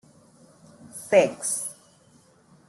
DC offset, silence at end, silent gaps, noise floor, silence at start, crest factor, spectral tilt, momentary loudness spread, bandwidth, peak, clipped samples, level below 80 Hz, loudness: under 0.1%; 0.95 s; none; -58 dBFS; 0.95 s; 22 dB; -3 dB/octave; 20 LU; 12.5 kHz; -6 dBFS; under 0.1%; -72 dBFS; -24 LUFS